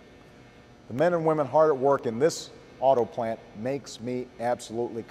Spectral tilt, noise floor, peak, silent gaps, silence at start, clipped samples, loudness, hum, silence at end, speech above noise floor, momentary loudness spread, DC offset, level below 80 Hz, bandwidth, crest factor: -5.5 dB/octave; -52 dBFS; -10 dBFS; none; 0.9 s; under 0.1%; -26 LUFS; none; 0 s; 26 dB; 12 LU; under 0.1%; -64 dBFS; 14 kHz; 18 dB